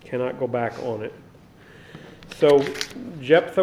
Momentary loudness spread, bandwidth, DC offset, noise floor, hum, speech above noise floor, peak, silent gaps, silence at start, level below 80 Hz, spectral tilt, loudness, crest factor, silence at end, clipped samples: 24 LU; 14.5 kHz; under 0.1%; -48 dBFS; none; 27 dB; -2 dBFS; none; 0.05 s; -58 dBFS; -5.5 dB/octave; -23 LUFS; 20 dB; 0 s; under 0.1%